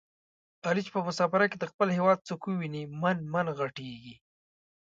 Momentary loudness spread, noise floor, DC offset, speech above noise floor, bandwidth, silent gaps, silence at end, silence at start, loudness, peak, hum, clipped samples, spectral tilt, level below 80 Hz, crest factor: 11 LU; under -90 dBFS; under 0.1%; over 60 dB; 7.8 kHz; 1.74-1.79 s; 0.7 s; 0.65 s; -30 LUFS; -10 dBFS; none; under 0.1%; -6.5 dB/octave; -72 dBFS; 20 dB